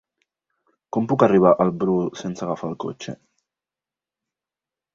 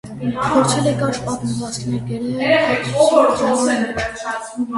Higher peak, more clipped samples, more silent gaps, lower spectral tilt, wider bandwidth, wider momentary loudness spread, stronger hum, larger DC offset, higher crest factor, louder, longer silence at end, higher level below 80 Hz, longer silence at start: about the same, -2 dBFS vs 0 dBFS; neither; neither; first, -7.5 dB/octave vs -5 dB/octave; second, 7.6 kHz vs 11.5 kHz; first, 18 LU vs 10 LU; neither; neither; about the same, 22 dB vs 18 dB; second, -21 LUFS vs -18 LUFS; first, 1.8 s vs 0 s; second, -60 dBFS vs -46 dBFS; first, 0.95 s vs 0.05 s